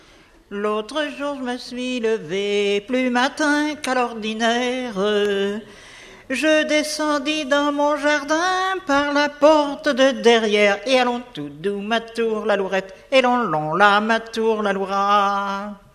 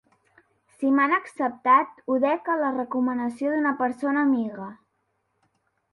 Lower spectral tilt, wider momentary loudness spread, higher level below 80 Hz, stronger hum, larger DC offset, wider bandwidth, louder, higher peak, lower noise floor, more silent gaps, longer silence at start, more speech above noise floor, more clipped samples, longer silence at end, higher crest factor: second, -3.5 dB/octave vs -6.5 dB/octave; about the same, 11 LU vs 9 LU; first, -56 dBFS vs -74 dBFS; neither; neither; first, 14 kHz vs 11.5 kHz; first, -20 LUFS vs -24 LUFS; first, 0 dBFS vs -6 dBFS; second, -50 dBFS vs -74 dBFS; neither; second, 0.5 s vs 0.8 s; second, 30 dB vs 50 dB; neither; second, 0.15 s vs 1.2 s; about the same, 20 dB vs 18 dB